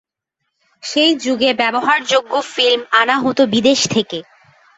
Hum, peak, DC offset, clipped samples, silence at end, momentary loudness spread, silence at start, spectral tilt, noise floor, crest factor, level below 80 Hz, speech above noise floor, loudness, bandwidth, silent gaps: none; -2 dBFS; under 0.1%; under 0.1%; 0.55 s; 8 LU; 0.85 s; -3 dB/octave; -75 dBFS; 16 dB; -60 dBFS; 60 dB; -15 LUFS; 8.2 kHz; none